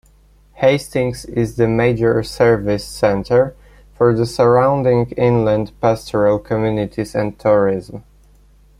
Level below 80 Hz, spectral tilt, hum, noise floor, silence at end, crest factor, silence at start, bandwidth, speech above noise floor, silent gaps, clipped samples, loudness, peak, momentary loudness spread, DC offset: -42 dBFS; -7 dB/octave; 50 Hz at -40 dBFS; -50 dBFS; 0.8 s; 14 dB; 0.6 s; 14.5 kHz; 34 dB; none; under 0.1%; -16 LUFS; -2 dBFS; 7 LU; under 0.1%